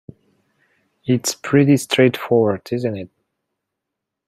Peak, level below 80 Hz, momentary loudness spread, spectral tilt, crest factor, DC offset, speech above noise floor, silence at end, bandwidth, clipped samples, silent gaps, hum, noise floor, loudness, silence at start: -2 dBFS; -62 dBFS; 15 LU; -5.5 dB/octave; 18 dB; under 0.1%; 64 dB; 1.2 s; 16 kHz; under 0.1%; none; none; -81 dBFS; -18 LUFS; 1.05 s